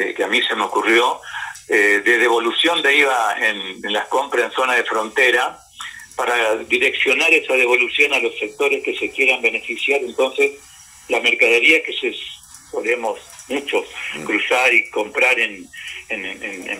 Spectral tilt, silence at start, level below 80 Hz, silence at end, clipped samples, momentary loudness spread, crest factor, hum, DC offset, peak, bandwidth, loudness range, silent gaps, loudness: -1.5 dB/octave; 0 s; -62 dBFS; 0 s; under 0.1%; 14 LU; 16 dB; none; under 0.1%; -2 dBFS; 16 kHz; 3 LU; none; -17 LUFS